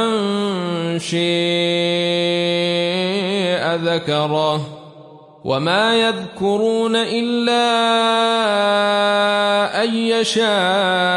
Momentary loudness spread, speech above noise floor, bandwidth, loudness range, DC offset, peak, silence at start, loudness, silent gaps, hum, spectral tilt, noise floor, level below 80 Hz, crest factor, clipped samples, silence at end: 6 LU; 25 dB; 11.5 kHz; 3 LU; under 0.1%; -4 dBFS; 0 s; -17 LUFS; none; none; -4.5 dB/octave; -42 dBFS; -64 dBFS; 14 dB; under 0.1%; 0 s